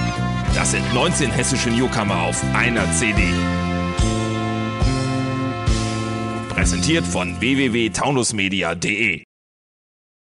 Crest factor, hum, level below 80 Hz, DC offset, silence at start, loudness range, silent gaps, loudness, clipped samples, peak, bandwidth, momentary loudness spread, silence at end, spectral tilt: 16 dB; none; -30 dBFS; under 0.1%; 0 s; 3 LU; none; -20 LUFS; under 0.1%; -4 dBFS; 11.5 kHz; 5 LU; 1.15 s; -4.5 dB/octave